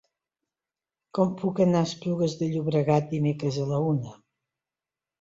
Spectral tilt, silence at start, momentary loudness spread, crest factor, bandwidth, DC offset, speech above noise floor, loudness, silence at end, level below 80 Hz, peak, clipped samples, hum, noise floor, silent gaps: -7.5 dB/octave; 1.15 s; 5 LU; 18 dB; 7.8 kHz; under 0.1%; over 65 dB; -26 LUFS; 1.05 s; -64 dBFS; -10 dBFS; under 0.1%; none; under -90 dBFS; none